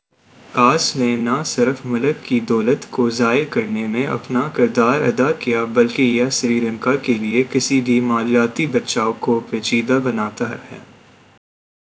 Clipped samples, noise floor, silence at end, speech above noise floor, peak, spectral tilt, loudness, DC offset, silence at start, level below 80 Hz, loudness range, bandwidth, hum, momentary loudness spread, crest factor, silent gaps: under 0.1%; -48 dBFS; 1.15 s; 30 dB; 0 dBFS; -4.5 dB/octave; -18 LUFS; under 0.1%; 0.5 s; -60 dBFS; 2 LU; 8 kHz; none; 5 LU; 18 dB; none